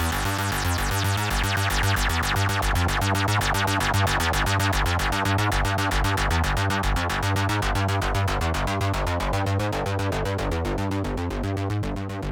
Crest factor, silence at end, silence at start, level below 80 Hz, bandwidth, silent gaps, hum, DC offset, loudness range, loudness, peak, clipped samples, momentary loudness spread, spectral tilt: 12 dB; 0 s; 0 s; -32 dBFS; 18 kHz; none; none; under 0.1%; 3 LU; -24 LUFS; -10 dBFS; under 0.1%; 5 LU; -4.5 dB/octave